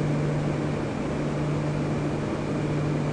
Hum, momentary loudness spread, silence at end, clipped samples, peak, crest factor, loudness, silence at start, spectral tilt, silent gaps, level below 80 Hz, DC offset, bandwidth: none; 2 LU; 0 s; under 0.1%; -14 dBFS; 12 dB; -27 LUFS; 0 s; -7.5 dB/octave; none; -44 dBFS; under 0.1%; 10 kHz